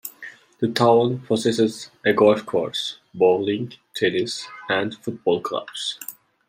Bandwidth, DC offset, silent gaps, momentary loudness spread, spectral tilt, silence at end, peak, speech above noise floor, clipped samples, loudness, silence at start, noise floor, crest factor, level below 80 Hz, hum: 16 kHz; under 0.1%; none; 14 LU; -5 dB/octave; 0.35 s; -4 dBFS; 22 dB; under 0.1%; -22 LUFS; 0.05 s; -43 dBFS; 18 dB; -68 dBFS; none